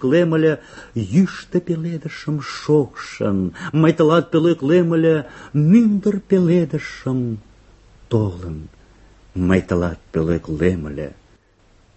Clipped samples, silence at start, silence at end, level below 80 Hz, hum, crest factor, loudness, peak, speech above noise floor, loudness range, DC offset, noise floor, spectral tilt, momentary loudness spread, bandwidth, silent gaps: under 0.1%; 0 s; 0.85 s; -40 dBFS; none; 16 dB; -19 LUFS; -2 dBFS; 36 dB; 7 LU; under 0.1%; -54 dBFS; -8 dB/octave; 13 LU; 8.4 kHz; none